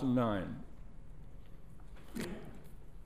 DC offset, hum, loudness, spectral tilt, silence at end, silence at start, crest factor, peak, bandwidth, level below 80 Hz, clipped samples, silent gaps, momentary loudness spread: 0.4%; none; -39 LUFS; -7 dB/octave; 0 s; 0 s; 18 dB; -22 dBFS; 15.5 kHz; -54 dBFS; under 0.1%; none; 23 LU